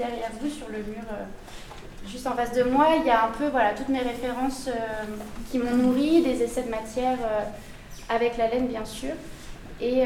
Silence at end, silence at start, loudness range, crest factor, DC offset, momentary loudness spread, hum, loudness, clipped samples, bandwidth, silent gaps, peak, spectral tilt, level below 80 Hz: 0 s; 0 s; 4 LU; 16 dB; under 0.1%; 21 LU; none; -26 LUFS; under 0.1%; 16.5 kHz; none; -10 dBFS; -5 dB/octave; -44 dBFS